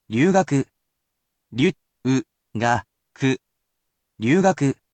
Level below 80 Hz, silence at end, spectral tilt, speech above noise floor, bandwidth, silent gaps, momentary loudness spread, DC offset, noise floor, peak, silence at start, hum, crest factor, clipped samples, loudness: -58 dBFS; 0.2 s; -6 dB/octave; 58 dB; 9 kHz; none; 11 LU; under 0.1%; -78 dBFS; -6 dBFS; 0.1 s; none; 18 dB; under 0.1%; -22 LUFS